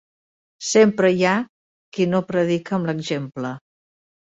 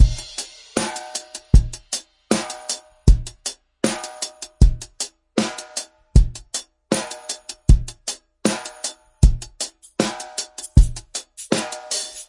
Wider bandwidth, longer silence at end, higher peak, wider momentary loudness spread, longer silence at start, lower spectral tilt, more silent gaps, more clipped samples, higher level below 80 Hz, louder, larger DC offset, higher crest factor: second, 8.2 kHz vs 11.5 kHz; first, 0.65 s vs 0.05 s; second, -4 dBFS vs 0 dBFS; first, 15 LU vs 12 LU; first, 0.6 s vs 0 s; about the same, -5 dB/octave vs -4.5 dB/octave; first, 1.49-1.92 s vs none; neither; second, -64 dBFS vs -22 dBFS; first, -20 LUFS vs -23 LUFS; neither; about the same, 18 dB vs 20 dB